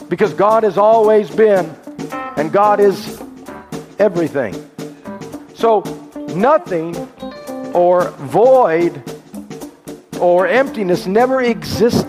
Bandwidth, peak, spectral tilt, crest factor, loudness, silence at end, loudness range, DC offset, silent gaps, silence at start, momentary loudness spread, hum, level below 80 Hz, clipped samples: 15.5 kHz; 0 dBFS; -6 dB/octave; 14 dB; -14 LUFS; 0 s; 5 LU; under 0.1%; none; 0 s; 20 LU; none; -52 dBFS; under 0.1%